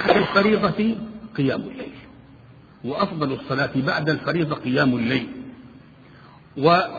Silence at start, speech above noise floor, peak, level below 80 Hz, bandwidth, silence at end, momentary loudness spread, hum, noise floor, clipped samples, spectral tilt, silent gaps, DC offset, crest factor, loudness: 0 s; 26 dB; -2 dBFS; -54 dBFS; 7 kHz; 0 s; 17 LU; none; -47 dBFS; under 0.1%; -8 dB/octave; none; under 0.1%; 20 dB; -22 LUFS